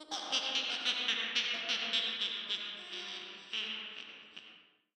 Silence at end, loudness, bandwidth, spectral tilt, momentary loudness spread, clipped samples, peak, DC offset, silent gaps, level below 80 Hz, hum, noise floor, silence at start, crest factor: 0.35 s; -34 LUFS; 16 kHz; 0.5 dB/octave; 15 LU; under 0.1%; -16 dBFS; under 0.1%; none; under -90 dBFS; none; -60 dBFS; 0 s; 22 dB